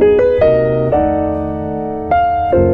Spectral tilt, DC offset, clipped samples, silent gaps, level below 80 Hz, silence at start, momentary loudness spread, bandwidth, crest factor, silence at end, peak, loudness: -10 dB/octave; under 0.1%; under 0.1%; none; -32 dBFS; 0 s; 9 LU; 4.8 kHz; 10 dB; 0 s; -2 dBFS; -14 LUFS